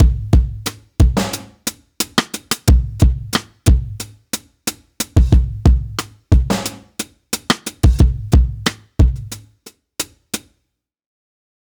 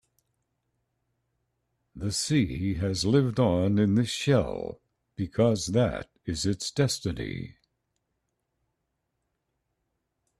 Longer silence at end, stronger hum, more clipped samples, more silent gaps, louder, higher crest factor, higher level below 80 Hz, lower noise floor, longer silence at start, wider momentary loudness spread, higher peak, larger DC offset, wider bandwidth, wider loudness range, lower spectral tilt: second, 1.3 s vs 2.9 s; neither; neither; neither; first, -18 LUFS vs -27 LUFS; about the same, 16 dB vs 18 dB; first, -18 dBFS vs -52 dBFS; second, -72 dBFS vs -80 dBFS; second, 0 s vs 1.95 s; about the same, 14 LU vs 13 LU; first, 0 dBFS vs -10 dBFS; neither; first, over 20 kHz vs 13.5 kHz; second, 2 LU vs 9 LU; about the same, -5 dB/octave vs -5.5 dB/octave